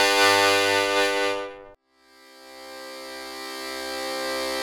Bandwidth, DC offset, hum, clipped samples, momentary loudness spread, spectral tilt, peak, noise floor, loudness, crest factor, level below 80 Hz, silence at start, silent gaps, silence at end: 19.5 kHz; under 0.1%; none; under 0.1%; 21 LU; -1 dB/octave; -4 dBFS; -57 dBFS; -22 LUFS; 20 dB; -62 dBFS; 0 s; none; 0 s